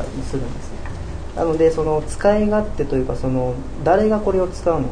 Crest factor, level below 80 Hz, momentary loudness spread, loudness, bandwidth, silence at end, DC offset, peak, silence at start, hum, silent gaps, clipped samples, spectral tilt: 16 dB; -30 dBFS; 14 LU; -20 LUFS; 10 kHz; 0 s; under 0.1%; -2 dBFS; 0 s; none; none; under 0.1%; -7 dB/octave